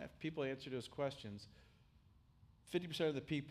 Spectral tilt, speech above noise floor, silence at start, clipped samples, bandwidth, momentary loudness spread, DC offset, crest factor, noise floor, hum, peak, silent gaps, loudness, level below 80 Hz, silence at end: -6 dB/octave; 26 dB; 0 s; under 0.1%; 15.5 kHz; 13 LU; under 0.1%; 18 dB; -69 dBFS; none; -26 dBFS; none; -44 LUFS; -72 dBFS; 0 s